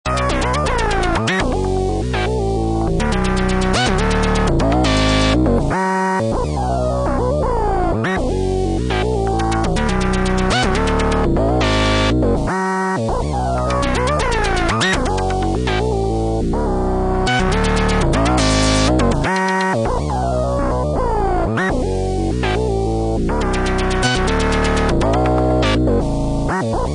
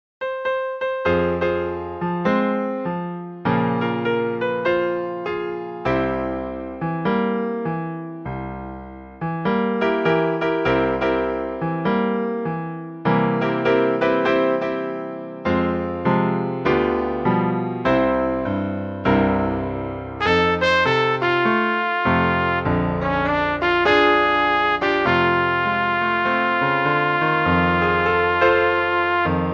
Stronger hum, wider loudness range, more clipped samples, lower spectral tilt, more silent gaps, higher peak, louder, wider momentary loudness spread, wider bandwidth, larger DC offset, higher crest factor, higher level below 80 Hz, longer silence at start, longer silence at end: neither; second, 2 LU vs 6 LU; neither; second, -5.5 dB/octave vs -7.5 dB/octave; neither; about the same, -4 dBFS vs -2 dBFS; first, -17 LUFS vs -20 LUFS; second, 4 LU vs 10 LU; first, 10.5 kHz vs 7.4 kHz; neither; second, 12 dB vs 18 dB; first, -22 dBFS vs -44 dBFS; second, 0.05 s vs 0.2 s; about the same, 0 s vs 0 s